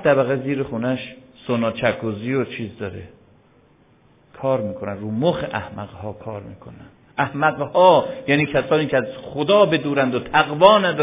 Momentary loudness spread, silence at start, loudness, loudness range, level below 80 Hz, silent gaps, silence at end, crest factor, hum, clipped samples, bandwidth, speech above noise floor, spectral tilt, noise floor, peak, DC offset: 19 LU; 0 s; -19 LUFS; 9 LU; -52 dBFS; none; 0 s; 20 dB; none; under 0.1%; 3.9 kHz; 35 dB; -10 dB/octave; -55 dBFS; 0 dBFS; under 0.1%